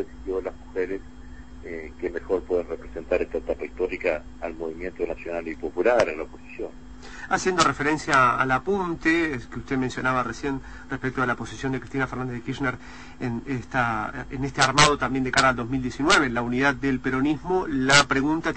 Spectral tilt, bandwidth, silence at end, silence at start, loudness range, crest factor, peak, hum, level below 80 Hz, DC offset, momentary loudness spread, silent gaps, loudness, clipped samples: -4 dB/octave; 8.8 kHz; 0 s; 0 s; 8 LU; 20 dB; -4 dBFS; none; -44 dBFS; 0.5%; 16 LU; none; -24 LUFS; under 0.1%